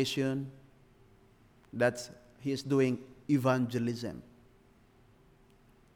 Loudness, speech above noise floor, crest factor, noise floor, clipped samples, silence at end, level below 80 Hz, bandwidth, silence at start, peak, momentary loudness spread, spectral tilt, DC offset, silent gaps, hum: -32 LUFS; 31 dB; 18 dB; -62 dBFS; under 0.1%; 1.75 s; -68 dBFS; 17.5 kHz; 0 s; -16 dBFS; 17 LU; -6 dB/octave; under 0.1%; none; none